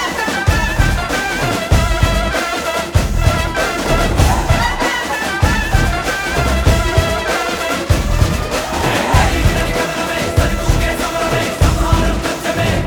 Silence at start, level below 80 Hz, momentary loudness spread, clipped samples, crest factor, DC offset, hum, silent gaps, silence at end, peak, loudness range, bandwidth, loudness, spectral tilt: 0 s; -20 dBFS; 4 LU; under 0.1%; 14 dB; under 0.1%; none; none; 0 s; 0 dBFS; 1 LU; over 20 kHz; -16 LUFS; -4.5 dB/octave